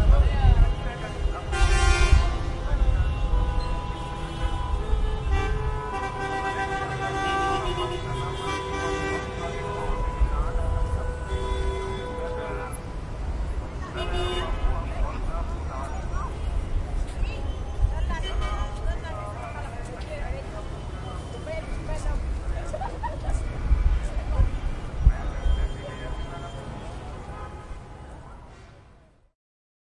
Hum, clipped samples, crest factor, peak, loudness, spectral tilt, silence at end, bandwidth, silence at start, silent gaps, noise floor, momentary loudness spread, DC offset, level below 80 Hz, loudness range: none; under 0.1%; 22 dB; -4 dBFS; -29 LUFS; -5.5 dB/octave; 1.05 s; 11.5 kHz; 0 s; none; -54 dBFS; 11 LU; under 0.1%; -28 dBFS; 9 LU